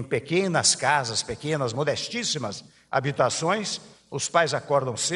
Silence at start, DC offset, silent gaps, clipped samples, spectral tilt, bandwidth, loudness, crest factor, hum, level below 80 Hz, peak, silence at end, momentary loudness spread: 0 s; under 0.1%; none; under 0.1%; -3 dB/octave; 11.5 kHz; -25 LUFS; 20 dB; none; -60 dBFS; -6 dBFS; 0 s; 10 LU